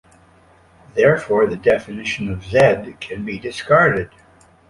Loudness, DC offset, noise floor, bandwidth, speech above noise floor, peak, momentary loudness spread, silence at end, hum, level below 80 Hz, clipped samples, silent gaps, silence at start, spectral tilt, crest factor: -18 LUFS; under 0.1%; -51 dBFS; 11.5 kHz; 34 dB; -2 dBFS; 13 LU; 0.65 s; none; -46 dBFS; under 0.1%; none; 0.95 s; -6 dB/octave; 18 dB